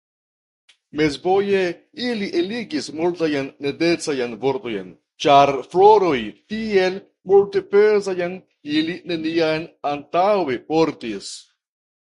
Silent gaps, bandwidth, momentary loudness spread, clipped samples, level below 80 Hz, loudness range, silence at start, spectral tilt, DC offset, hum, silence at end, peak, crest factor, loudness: none; 11 kHz; 14 LU; under 0.1%; -58 dBFS; 6 LU; 0.95 s; -5 dB/octave; under 0.1%; none; 0.75 s; 0 dBFS; 20 dB; -20 LUFS